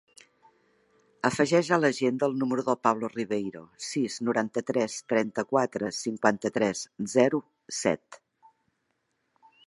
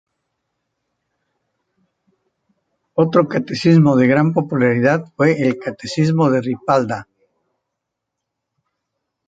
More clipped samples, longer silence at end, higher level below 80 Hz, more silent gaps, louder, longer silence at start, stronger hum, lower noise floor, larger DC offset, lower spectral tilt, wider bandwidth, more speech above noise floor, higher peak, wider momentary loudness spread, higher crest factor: neither; second, 1.5 s vs 2.25 s; second, -72 dBFS vs -60 dBFS; neither; second, -28 LUFS vs -16 LUFS; second, 1.25 s vs 2.95 s; neither; about the same, -77 dBFS vs -79 dBFS; neither; second, -4.5 dB/octave vs -7.5 dB/octave; first, 11.5 kHz vs 7.8 kHz; second, 50 dB vs 64 dB; about the same, -4 dBFS vs -2 dBFS; about the same, 8 LU vs 10 LU; first, 24 dB vs 18 dB